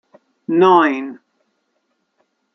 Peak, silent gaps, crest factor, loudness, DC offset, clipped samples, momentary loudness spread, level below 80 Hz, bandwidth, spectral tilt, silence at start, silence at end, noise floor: -2 dBFS; none; 18 dB; -14 LUFS; under 0.1%; under 0.1%; 21 LU; -72 dBFS; 6.2 kHz; -7 dB/octave; 0.5 s; 1.4 s; -69 dBFS